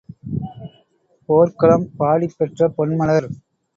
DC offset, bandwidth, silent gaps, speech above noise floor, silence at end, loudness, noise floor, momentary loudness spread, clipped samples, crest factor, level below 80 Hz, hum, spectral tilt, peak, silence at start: under 0.1%; 7.4 kHz; none; 43 dB; 0.45 s; -18 LUFS; -60 dBFS; 18 LU; under 0.1%; 18 dB; -50 dBFS; none; -9 dB/octave; 0 dBFS; 0.25 s